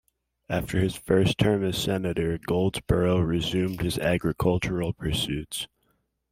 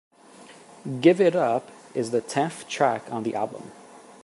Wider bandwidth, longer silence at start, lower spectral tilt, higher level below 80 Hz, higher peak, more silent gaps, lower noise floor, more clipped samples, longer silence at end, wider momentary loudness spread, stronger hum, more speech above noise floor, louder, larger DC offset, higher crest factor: first, 16 kHz vs 11.5 kHz; about the same, 0.5 s vs 0.4 s; about the same, -6 dB/octave vs -5.5 dB/octave; first, -44 dBFS vs -74 dBFS; about the same, -6 dBFS vs -4 dBFS; neither; first, -72 dBFS vs -49 dBFS; neither; first, 0.65 s vs 0.25 s; second, 7 LU vs 16 LU; neither; first, 46 dB vs 25 dB; about the same, -26 LUFS vs -24 LUFS; neither; about the same, 20 dB vs 20 dB